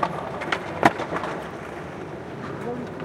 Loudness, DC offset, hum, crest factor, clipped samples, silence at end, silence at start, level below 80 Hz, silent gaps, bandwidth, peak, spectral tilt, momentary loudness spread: -28 LUFS; under 0.1%; none; 26 dB; under 0.1%; 0 s; 0 s; -54 dBFS; none; 16 kHz; -2 dBFS; -5.5 dB/octave; 14 LU